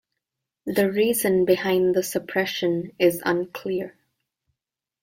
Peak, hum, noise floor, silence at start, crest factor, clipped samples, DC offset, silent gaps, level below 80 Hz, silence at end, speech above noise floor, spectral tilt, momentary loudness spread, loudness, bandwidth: -6 dBFS; none; -87 dBFS; 0.65 s; 18 dB; under 0.1%; under 0.1%; none; -62 dBFS; 1.15 s; 65 dB; -4.5 dB/octave; 9 LU; -23 LUFS; 16.5 kHz